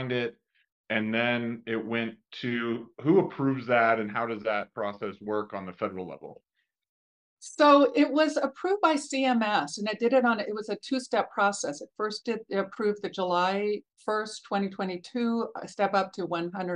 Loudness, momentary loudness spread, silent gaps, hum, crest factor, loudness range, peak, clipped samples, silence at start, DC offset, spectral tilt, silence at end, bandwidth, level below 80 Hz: -28 LUFS; 11 LU; 0.72-0.84 s, 6.89-7.37 s; none; 20 dB; 6 LU; -8 dBFS; under 0.1%; 0 s; under 0.1%; -5 dB/octave; 0 s; 11 kHz; -78 dBFS